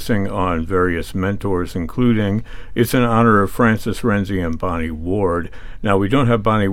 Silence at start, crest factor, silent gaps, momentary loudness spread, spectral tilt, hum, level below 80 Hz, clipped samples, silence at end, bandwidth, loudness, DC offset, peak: 0 s; 16 dB; none; 9 LU; -7 dB/octave; none; -32 dBFS; under 0.1%; 0 s; 17 kHz; -18 LUFS; under 0.1%; -2 dBFS